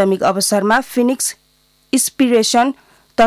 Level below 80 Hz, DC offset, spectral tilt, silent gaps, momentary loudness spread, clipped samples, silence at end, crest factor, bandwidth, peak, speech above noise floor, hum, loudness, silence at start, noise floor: -56 dBFS; under 0.1%; -3 dB/octave; none; 7 LU; under 0.1%; 0 s; 12 dB; 16 kHz; -4 dBFS; 42 dB; none; -15 LUFS; 0 s; -57 dBFS